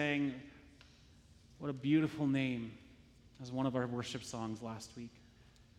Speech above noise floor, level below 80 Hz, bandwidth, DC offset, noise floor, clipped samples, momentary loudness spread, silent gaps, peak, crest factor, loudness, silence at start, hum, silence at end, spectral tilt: 26 dB; -68 dBFS; 12.5 kHz; under 0.1%; -63 dBFS; under 0.1%; 20 LU; none; -20 dBFS; 20 dB; -38 LUFS; 0 s; none; 0.15 s; -6 dB/octave